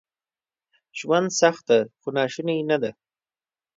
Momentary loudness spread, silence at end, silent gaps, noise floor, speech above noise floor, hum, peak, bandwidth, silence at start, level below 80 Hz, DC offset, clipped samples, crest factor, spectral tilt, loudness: 12 LU; 0.85 s; none; under -90 dBFS; over 68 dB; none; -4 dBFS; 7.8 kHz; 0.95 s; -74 dBFS; under 0.1%; under 0.1%; 22 dB; -4 dB/octave; -23 LUFS